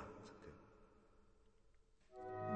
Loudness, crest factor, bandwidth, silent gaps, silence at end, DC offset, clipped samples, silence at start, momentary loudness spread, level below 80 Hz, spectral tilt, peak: -56 LUFS; 20 dB; 8.8 kHz; none; 0 s; under 0.1%; under 0.1%; 0 s; 17 LU; -72 dBFS; -7.5 dB/octave; -32 dBFS